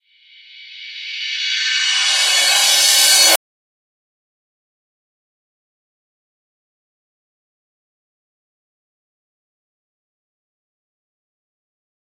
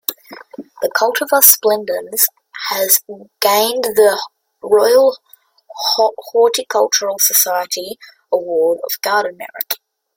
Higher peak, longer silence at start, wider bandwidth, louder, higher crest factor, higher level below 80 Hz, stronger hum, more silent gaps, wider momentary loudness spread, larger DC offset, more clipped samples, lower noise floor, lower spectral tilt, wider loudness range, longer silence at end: about the same, 0 dBFS vs 0 dBFS; first, 0.55 s vs 0.1 s; about the same, 16.5 kHz vs 17 kHz; about the same, -12 LUFS vs -14 LUFS; first, 22 dB vs 16 dB; second, -74 dBFS vs -66 dBFS; neither; neither; first, 18 LU vs 14 LU; neither; neither; first, -47 dBFS vs -35 dBFS; second, 4 dB/octave vs 0 dB/octave; about the same, 4 LU vs 3 LU; first, 8.65 s vs 0.4 s